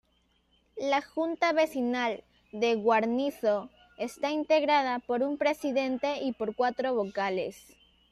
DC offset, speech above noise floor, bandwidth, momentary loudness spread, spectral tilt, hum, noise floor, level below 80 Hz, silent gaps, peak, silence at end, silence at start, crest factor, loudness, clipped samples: under 0.1%; 42 dB; 14 kHz; 10 LU; -4.5 dB/octave; none; -70 dBFS; -70 dBFS; none; -12 dBFS; 0.55 s; 0.75 s; 16 dB; -29 LUFS; under 0.1%